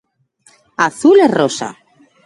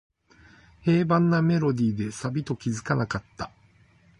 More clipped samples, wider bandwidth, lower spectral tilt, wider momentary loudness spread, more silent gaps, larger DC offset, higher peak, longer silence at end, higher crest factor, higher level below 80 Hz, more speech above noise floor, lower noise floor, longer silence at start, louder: neither; about the same, 11.5 kHz vs 10.5 kHz; second, -4.5 dB/octave vs -7 dB/octave; first, 17 LU vs 12 LU; neither; neither; first, 0 dBFS vs -10 dBFS; second, 0.55 s vs 0.7 s; about the same, 16 dB vs 18 dB; second, -62 dBFS vs -56 dBFS; first, 42 dB vs 34 dB; second, -54 dBFS vs -59 dBFS; about the same, 0.8 s vs 0.85 s; first, -13 LUFS vs -25 LUFS